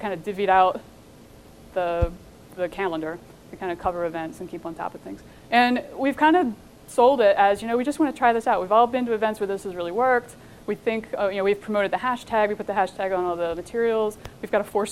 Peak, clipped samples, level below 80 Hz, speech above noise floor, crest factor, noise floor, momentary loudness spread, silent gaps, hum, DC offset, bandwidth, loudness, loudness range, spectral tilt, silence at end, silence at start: -4 dBFS; under 0.1%; -46 dBFS; 25 dB; 20 dB; -48 dBFS; 15 LU; none; none; 0.1%; 15.5 kHz; -23 LUFS; 9 LU; -5.5 dB/octave; 0 s; 0 s